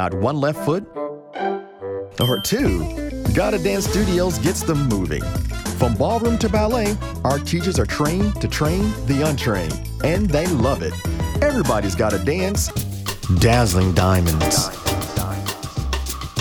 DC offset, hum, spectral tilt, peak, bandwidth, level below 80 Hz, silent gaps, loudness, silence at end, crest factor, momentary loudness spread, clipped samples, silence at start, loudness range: under 0.1%; none; -5 dB/octave; -2 dBFS; over 20 kHz; -30 dBFS; none; -20 LUFS; 0 s; 18 dB; 9 LU; under 0.1%; 0 s; 2 LU